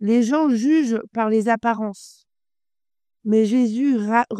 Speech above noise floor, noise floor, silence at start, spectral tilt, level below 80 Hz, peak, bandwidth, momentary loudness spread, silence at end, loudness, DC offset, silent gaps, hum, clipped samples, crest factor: over 71 dB; under -90 dBFS; 0 s; -6 dB/octave; -70 dBFS; -4 dBFS; 10 kHz; 6 LU; 0 s; -20 LUFS; under 0.1%; none; none; under 0.1%; 16 dB